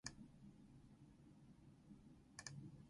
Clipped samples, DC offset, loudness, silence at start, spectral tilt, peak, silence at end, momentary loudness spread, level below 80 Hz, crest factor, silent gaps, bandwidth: under 0.1%; under 0.1%; -62 LUFS; 0.05 s; -3.5 dB/octave; -32 dBFS; 0 s; 11 LU; -76 dBFS; 30 dB; none; 11 kHz